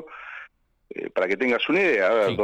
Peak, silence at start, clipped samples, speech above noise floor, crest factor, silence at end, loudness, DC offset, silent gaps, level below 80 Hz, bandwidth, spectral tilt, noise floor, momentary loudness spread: -12 dBFS; 0 s; under 0.1%; 29 dB; 12 dB; 0 s; -22 LUFS; under 0.1%; none; -62 dBFS; 10 kHz; -5.5 dB/octave; -51 dBFS; 20 LU